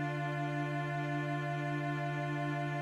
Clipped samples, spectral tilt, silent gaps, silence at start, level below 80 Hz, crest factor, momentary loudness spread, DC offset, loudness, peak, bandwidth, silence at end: under 0.1%; -7.5 dB/octave; none; 0 s; -72 dBFS; 10 dB; 0 LU; under 0.1%; -36 LUFS; -24 dBFS; 11.5 kHz; 0 s